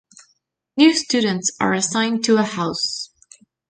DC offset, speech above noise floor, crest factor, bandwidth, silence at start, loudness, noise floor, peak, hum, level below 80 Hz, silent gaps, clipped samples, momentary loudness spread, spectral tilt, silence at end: under 0.1%; 48 dB; 20 dB; 9.6 kHz; 0.75 s; -19 LUFS; -67 dBFS; -2 dBFS; none; -62 dBFS; none; under 0.1%; 11 LU; -3.5 dB/octave; 0.65 s